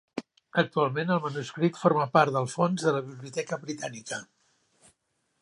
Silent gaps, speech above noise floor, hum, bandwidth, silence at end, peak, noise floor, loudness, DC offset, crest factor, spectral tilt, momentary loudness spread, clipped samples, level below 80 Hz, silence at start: none; 48 dB; none; 11.5 kHz; 1.15 s; -6 dBFS; -76 dBFS; -28 LUFS; under 0.1%; 22 dB; -5.5 dB/octave; 14 LU; under 0.1%; -74 dBFS; 0.15 s